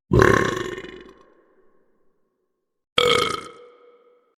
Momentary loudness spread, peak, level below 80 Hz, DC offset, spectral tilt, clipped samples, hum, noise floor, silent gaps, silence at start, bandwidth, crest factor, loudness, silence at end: 21 LU; 0 dBFS; -40 dBFS; under 0.1%; -4.5 dB/octave; under 0.1%; none; -74 dBFS; 2.92-2.96 s; 0.1 s; 15.5 kHz; 24 dB; -20 LUFS; 0.9 s